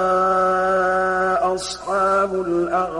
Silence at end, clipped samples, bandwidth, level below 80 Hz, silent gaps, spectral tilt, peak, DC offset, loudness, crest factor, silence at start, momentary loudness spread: 0 s; under 0.1%; 11.5 kHz; -48 dBFS; none; -4.5 dB/octave; -8 dBFS; under 0.1%; -19 LUFS; 10 dB; 0 s; 5 LU